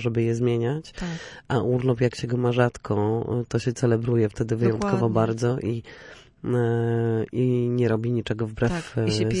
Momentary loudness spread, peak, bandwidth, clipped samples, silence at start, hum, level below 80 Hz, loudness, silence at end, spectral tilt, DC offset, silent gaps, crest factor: 8 LU; -8 dBFS; 10.5 kHz; under 0.1%; 0 s; none; -48 dBFS; -24 LUFS; 0 s; -7 dB/octave; under 0.1%; none; 16 dB